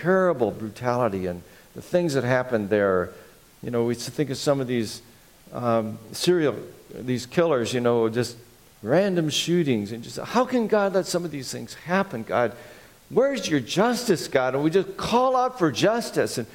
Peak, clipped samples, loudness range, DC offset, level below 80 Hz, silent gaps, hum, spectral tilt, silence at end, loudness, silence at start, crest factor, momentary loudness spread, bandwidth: -4 dBFS; under 0.1%; 3 LU; under 0.1%; -58 dBFS; none; none; -5 dB/octave; 0.05 s; -24 LUFS; 0 s; 20 dB; 12 LU; 17 kHz